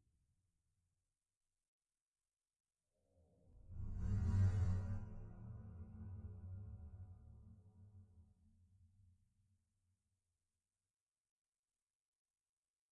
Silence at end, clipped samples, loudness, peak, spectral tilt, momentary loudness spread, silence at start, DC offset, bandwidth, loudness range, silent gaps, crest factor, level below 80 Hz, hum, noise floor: 4.7 s; under 0.1%; -45 LUFS; -26 dBFS; -9 dB/octave; 27 LU; 3.5 s; under 0.1%; 8 kHz; 17 LU; none; 22 dB; -56 dBFS; none; under -90 dBFS